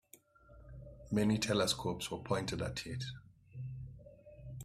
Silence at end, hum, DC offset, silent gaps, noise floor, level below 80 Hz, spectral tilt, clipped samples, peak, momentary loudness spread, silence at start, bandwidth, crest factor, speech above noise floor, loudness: 0 s; none; under 0.1%; none; -63 dBFS; -58 dBFS; -4.5 dB/octave; under 0.1%; -20 dBFS; 22 LU; 0.15 s; 15 kHz; 20 dB; 27 dB; -36 LUFS